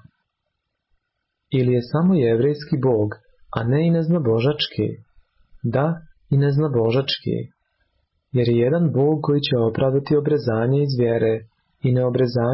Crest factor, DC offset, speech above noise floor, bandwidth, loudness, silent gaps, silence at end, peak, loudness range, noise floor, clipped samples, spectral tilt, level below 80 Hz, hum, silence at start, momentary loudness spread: 12 dB; under 0.1%; 58 dB; 5.8 kHz; -20 LUFS; none; 0 s; -10 dBFS; 3 LU; -77 dBFS; under 0.1%; -11.5 dB/octave; -52 dBFS; none; 1.5 s; 9 LU